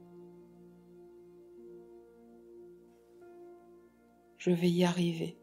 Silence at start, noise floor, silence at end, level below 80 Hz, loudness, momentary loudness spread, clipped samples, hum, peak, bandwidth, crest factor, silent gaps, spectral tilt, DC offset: 0.1 s; -63 dBFS; 0.1 s; -76 dBFS; -31 LUFS; 28 LU; under 0.1%; none; -14 dBFS; 13.5 kHz; 22 dB; none; -6.5 dB/octave; under 0.1%